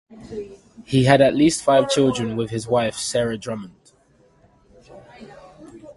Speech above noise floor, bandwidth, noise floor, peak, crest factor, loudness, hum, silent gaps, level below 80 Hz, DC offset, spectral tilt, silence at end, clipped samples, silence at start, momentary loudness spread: 38 dB; 11.5 kHz; -57 dBFS; 0 dBFS; 20 dB; -19 LUFS; none; none; -52 dBFS; under 0.1%; -5 dB/octave; 0.05 s; under 0.1%; 0.1 s; 20 LU